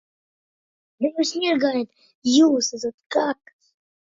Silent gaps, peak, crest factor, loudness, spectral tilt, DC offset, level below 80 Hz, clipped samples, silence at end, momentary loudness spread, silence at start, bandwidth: 2.15-2.22 s, 2.94-2.98 s, 3.06-3.10 s; -6 dBFS; 18 dB; -22 LUFS; -2.5 dB/octave; under 0.1%; -72 dBFS; under 0.1%; 0.7 s; 13 LU; 1 s; 7.8 kHz